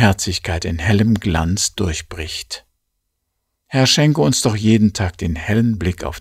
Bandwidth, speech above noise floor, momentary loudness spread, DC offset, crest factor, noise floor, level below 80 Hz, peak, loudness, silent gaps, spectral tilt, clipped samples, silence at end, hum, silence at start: 15.5 kHz; 57 dB; 12 LU; under 0.1%; 18 dB; -74 dBFS; -34 dBFS; 0 dBFS; -17 LUFS; none; -4.5 dB/octave; under 0.1%; 0 s; none; 0 s